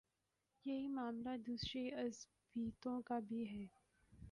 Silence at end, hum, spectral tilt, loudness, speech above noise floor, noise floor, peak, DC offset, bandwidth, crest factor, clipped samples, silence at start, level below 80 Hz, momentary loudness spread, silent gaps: 0 s; none; -5 dB/octave; -46 LUFS; 43 dB; -88 dBFS; -34 dBFS; under 0.1%; 11 kHz; 14 dB; under 0.1%; 0.65 s; -70 dBFS; 9 LU; none